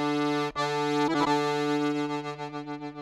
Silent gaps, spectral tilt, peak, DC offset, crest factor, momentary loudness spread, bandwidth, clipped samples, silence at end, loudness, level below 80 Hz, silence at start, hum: none; -5 dB/octave; -12 dBFS; under 0.1%; 16 dB; 11 LU; 13 kHz; under 0.1%; 0 s; -28 LUFS; -64 dBFS; 0 s; 50 Hz at -65 dBFS